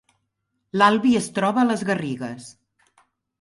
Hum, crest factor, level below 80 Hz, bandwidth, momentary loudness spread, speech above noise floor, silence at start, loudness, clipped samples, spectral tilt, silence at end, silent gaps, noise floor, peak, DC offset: none; 20 dB; -64 dBFS; 11.5 kHz; 14 LU; 55 dB; 0.75 s; -21 LUFS; under 0.1%; -5 dB/octave; 0.9 s; none; -76 dBFS; -4 dBFS; under 0.1%